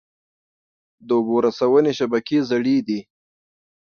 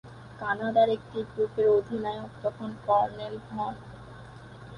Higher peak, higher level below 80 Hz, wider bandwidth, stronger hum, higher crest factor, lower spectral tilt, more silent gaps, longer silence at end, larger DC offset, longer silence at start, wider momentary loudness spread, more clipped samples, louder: first, -4 dBFS vs -10 dBFS; second, -66 dBFS vs -58 dBFS; second, 6.8 kHz vs 10 kHz; neither; about the same, 16 dB vs 18 dB; about the same, -6.5 dB/octave vs -7 dB/octave; neither; first, 0.95 s vs 0 s; neither; first, 1.05 s vs 0.05 s; second, 6 LU vs 22 LU; neither; first, -20 LUFS vs -28 LUFS